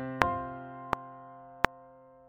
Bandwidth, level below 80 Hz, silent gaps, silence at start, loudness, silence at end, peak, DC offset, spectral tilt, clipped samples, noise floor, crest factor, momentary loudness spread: 6.8 kHz; -54 dBFS; none; 0 s; -34 LUFS; 0 s; 0 dBFS; under 0.1%; -3.5 dB/octave; under 0.1%; -55 dBFS; 34 dB; 19 LU